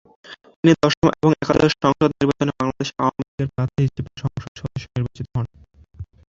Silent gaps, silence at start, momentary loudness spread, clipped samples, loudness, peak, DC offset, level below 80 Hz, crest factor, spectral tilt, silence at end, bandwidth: 0.56-0.63 s, 0.97-1.02 s, 3.28-3.38 s, 4.48-4.55 s; 0.3 s; 14 LU; under 0.1%; -21 LUFS; -2 dBFS; under 0.1%; -44 dBFS; 20 dB; -6.5 dB/octave; 0.25 s; 7.6 kHz